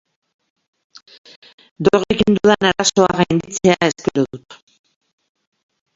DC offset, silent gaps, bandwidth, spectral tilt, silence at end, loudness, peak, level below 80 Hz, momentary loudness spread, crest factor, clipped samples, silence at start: under 0.1%; none; 7.8 kHz; -4.5 dB/octave; 1.4 s; -16 LUFS; 0 dBFS; -48 dBFS; 7 LU; 18 dB; under 0.1%; 1.8 s